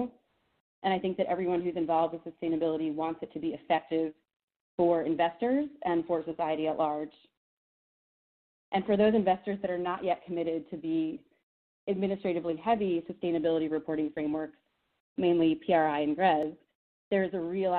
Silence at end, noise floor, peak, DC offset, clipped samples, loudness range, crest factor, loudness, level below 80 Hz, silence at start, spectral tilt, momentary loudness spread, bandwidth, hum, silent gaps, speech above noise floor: 0 s; -67 dBFS; -12 dBFS; under 0.1%; under 0.1%; 3 LU; 18 dB; -30 LUFS; -68 dBFS; 0 s; -5 dB/octave; 10 LU; 4.4 kHz; none; 0.60-0.82 s, 4.36-4.48 s, 4.56-4.78 s, 7.37-8.72 s, 11.43-11.87 s, 15.00-15.16 s, 16.75-17.11 s; 38 dB